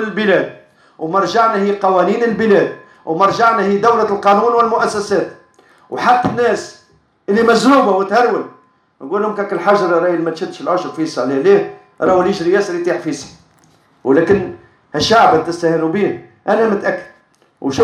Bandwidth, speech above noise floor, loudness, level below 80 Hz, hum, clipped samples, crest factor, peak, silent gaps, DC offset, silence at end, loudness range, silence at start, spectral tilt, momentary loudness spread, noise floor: 11.5 kHz; 39 dB; -14 LUFS; -52 dBFS; none; under 0.1%; 14 dB; 0 dBFS; none; under 0.1%; 0 s; 3 LU; 0 s; -5.5 dB/octave; 13 LU; -53 dBFS